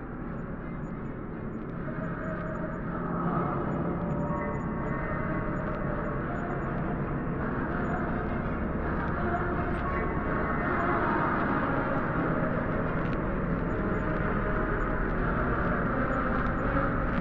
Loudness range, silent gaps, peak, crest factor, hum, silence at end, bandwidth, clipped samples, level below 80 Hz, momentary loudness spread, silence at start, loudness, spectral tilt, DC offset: 4 LU; none; -16 dBFS; 14 dB; none; 0 s; 7.2 kHz; under 0.1%; -38 dBFS; 7 LU; 0 s; -30 LUFS; -10 dB/octave; under 0.1%